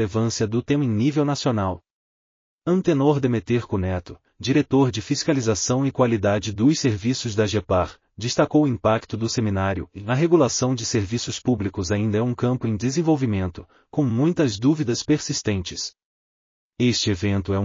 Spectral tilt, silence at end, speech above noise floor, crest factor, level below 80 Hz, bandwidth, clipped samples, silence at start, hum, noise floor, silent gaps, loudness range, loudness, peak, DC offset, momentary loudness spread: -6 dB/octave; 0 s; over 69 dB; 16 dB; -54 dBFS; 7.4 kHz; under 0.1%; 0 s; none; under -90 dBFS; 1.92-2.58 s, 16.05-16.71 s; 2 LU; -22 LUFS; -6 dBFS; under 0.1%; 7 LU